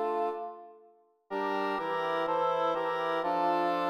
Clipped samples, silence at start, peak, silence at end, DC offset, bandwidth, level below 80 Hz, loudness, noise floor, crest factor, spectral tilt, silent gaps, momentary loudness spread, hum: under 0.1%; 0 s; -18 dBFS; 0 s; under 0.1%; 15 kHz; -76 dBFS; -31 LUFS; -62 dBFS; 14 dB; -5.5 dB/octave; none; 11 LU; none